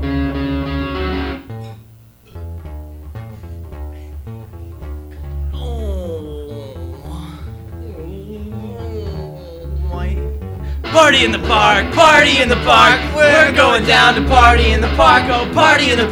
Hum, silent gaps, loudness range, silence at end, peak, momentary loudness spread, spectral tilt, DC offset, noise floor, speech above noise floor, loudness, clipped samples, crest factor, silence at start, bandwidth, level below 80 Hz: none; none; 21 LU; 0 s; 0 dBFS; 23 LU; -4.5 dB/octave; under 0.1%; -43 dBFS; 33 dB; -12 LUFS; under 0.1%; 16 dB; 0 s; 16.5 kHz; -26 dBFS